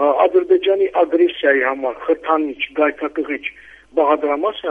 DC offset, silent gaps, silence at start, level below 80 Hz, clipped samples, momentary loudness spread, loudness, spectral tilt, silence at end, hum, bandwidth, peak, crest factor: under 0.1%; none; 0 s; -58 dBFS; under 0.1%; 9 LU; -17 LUFS; -5.5 dB/octave; 0 s; none; 4.5 kHz; 0 dBFS; 16 dB